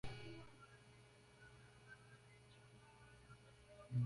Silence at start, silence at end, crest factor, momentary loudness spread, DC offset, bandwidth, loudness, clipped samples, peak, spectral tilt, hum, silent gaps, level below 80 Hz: 0.05 s; 0 s; 20 dB; 10 LU; under 0.1%; 11.5 kHz; -60 LUFS; under 0.1%; -32 dBFS; -6.5 dB/octave; none; none; -70 dBFS